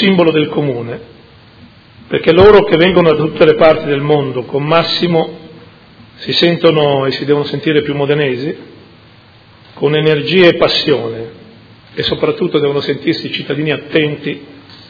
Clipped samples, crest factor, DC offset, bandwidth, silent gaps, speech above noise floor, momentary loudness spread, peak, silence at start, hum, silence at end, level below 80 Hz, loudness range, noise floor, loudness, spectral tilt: 0.5%; 12 dB; under 0.1%; 5.4 kHz; none; 30 dB; 14 LU; 0 dBFS; 0 s; none; 0.15 s; -44 dBFS; 6 LU; -42 dBFS; -12 LUFS; -7.5 dB/octave